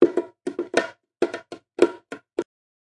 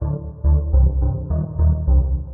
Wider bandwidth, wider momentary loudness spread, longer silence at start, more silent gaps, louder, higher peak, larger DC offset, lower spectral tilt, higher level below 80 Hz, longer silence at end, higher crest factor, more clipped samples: first, 11 kHz vs 1.6 kHz; first, 16 LU vs 7 LU; about the same, 0 s vs 0 s; neither; second, -26 LUFS vs -20 LUFS; first, -2 dBFS vs -6 dBFS; neither; second, -4.5 dB/octave vs -13 dB/octave; second, -70 dBFS vs -18 dBFS; first, 0.45 s vs 0 s; first, 24 dB vs 12 dB; neither